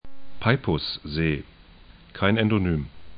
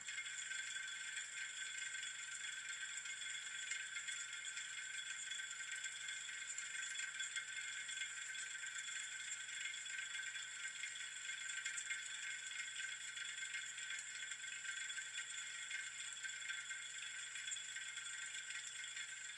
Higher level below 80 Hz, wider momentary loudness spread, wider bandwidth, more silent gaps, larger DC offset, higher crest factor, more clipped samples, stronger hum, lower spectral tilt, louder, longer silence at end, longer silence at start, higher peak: first, -44 dBFS vs under -90 dBFS; first, 8 LU vs 2 LU; second, 5.2 kHz vs 12 kHz; neither; neither; about the same, 22 dB vs 18 dB; neither; neither; first, -11 dB/octave vs 3.5 dB/octave; first, -25 LUFS vs -45 LUFS; about the same, 0 s vs 0 s; about the same, 0 s vs 0 s; first, -4 dBFS vs -30 dBFS